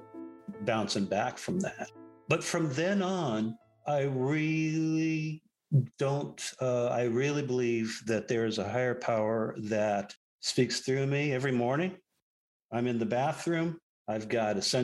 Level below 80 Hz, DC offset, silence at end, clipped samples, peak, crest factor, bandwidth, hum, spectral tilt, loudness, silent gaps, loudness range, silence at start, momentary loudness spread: -72 dBFS; under 0.1%; 0 s; under 0.1%; -12 dBFS; 18 dB; 12.5 kHz; none; -5.5 dB/octave; -31 LUFS; 10.17-10.39 s, 12.22-12.69 s, 13.83-14.05 s; 2 LU; 0 s; 8 LU